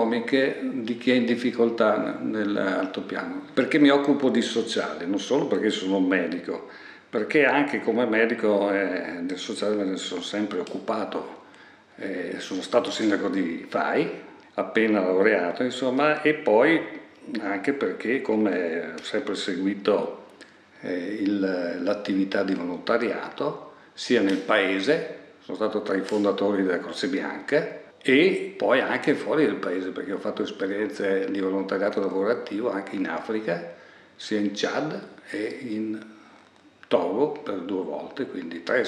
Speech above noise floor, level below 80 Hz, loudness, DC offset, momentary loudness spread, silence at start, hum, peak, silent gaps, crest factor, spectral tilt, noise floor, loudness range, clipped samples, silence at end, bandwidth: 29 dB; -78 dBFS; -25 LUFS; under 0.1%; 11 LU; 0 s; none; -6 dBFS; none; 20 dB; -5 dB/octave; -54 dBFS; 6 LU; under 0.1%; 0 s; 10.5 kHz